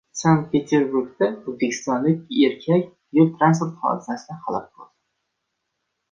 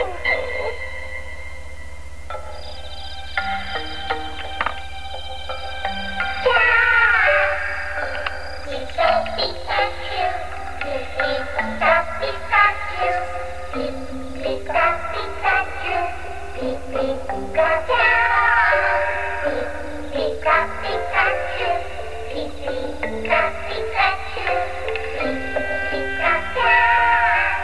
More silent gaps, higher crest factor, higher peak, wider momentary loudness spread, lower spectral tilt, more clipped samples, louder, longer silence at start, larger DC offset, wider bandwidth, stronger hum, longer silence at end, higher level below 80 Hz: neither; about the same, 18 dB vs 18 dB; about the same, -4 dBFS vs -4 dBFS; second, 10 LU vs 17 LU; first, -6.5 dB/octave vs -4.5 dB/octave; neither; about the same, -21 LUFS vs -20 LUFS; first, 0.15 s vs 0 s; second, under 0.1% vs 3%; second, 7.6 kHz vs 11 kHz; neither; first, 1.25 s vs 0 s; second, -62 dBFS vs -38 dBFS